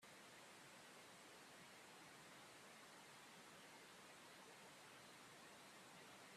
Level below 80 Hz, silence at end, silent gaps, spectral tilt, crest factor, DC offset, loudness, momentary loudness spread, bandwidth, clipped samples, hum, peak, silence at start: under -90 dBFS; 0 s; none; -2 dB/octave; 14 dB; under 0.1%; -62 LUFS; 0 LU; 14.5 kHz; under 0.1%; none; -50 dBFS; 0 s